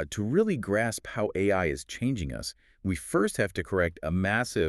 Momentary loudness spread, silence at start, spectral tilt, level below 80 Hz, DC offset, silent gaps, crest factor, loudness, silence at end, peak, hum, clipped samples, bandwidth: 7 LU; 0 s; -5.5 dB/octave; -48 dBFS; under 0.1%; none; 18 dB; -29 LUFS; 0 s; -10 dBFS; none; under 0.1%; 13.5 kHz